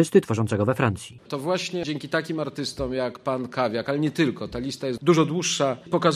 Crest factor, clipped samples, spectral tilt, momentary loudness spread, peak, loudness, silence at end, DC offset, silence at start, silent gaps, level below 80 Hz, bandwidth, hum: 20 dB; under 0.1%; -5 dB/octave; 9 LU; -4 dBFS; -25 LUFS; 0 s; under 0.1%; 0 s; none; -50 dBFS; 14.5 kHz; none